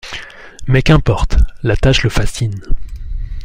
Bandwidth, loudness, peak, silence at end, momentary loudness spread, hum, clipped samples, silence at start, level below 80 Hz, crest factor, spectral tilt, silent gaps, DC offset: 15.5 kHz; -15 LUFS; 0 dBFS; 0 s; 17 LU; none; under 0.1%; 0.05 s; -18 dBFS; 12 dB; -6 dB/octave; none; under 0.1%